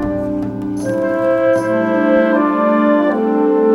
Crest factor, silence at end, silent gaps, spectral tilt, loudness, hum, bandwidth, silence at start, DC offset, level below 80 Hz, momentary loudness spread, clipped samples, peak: 12 dB; 0 s; none; -7.5 dB/octave; -15 LUFS; none; 12 kHz; 0 s; under 0.1%; -44 dBFS; 8 LU; under 0.1%; -2 dBFS